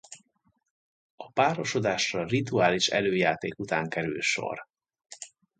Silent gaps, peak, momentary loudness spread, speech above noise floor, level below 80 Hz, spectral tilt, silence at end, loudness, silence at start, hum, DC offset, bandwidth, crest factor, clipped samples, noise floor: 0.70-1.18 s; -8 dBFS; 17 LU; 45 dB; -64 dBFS; -4 dB/octave; 0.3 s; -27 LUFS; 0.1 s; none; under 0.1%; 9.4 kHz; 20 dB; under 0.1%; -72 dBFS